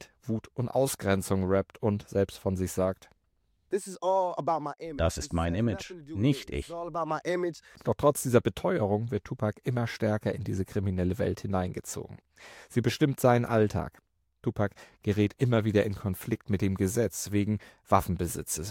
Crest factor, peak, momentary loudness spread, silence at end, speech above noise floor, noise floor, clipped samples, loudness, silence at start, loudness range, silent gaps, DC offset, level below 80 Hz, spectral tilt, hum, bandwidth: 22 dB; -8 dBFS; 10 LU; 0 s; 44 dB; -73 dBFS; under 0.1%; -30 LUFS; 0 s; 3 LU; none; under 0.1%; -50 dBFS; -6 dB/octave; none; 17 kHz